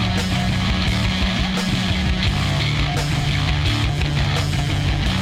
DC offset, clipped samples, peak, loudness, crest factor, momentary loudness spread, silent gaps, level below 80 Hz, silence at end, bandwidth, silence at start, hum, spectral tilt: under 0.1%; under 0.1%; -8 dBFS; -20 LUFS; 12 dB; 1 LU; none; -26 dBFS; 0 s; 16 kHz; 0 s; none; -5 dB/octave